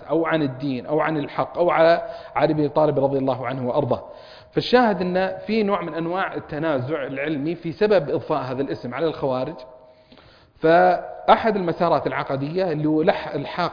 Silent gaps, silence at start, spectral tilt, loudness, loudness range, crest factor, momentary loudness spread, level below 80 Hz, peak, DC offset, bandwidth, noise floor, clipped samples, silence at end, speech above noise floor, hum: none; 0 s; -8 dB/octave; -22 LUFS; 4 LU; 20 dB; 9 LU; -54 dBFS; -2 dBFS; under 0.1%; 5.2 kHz; -50 dBFS; under 0.1%; 0 s; 29 dB; none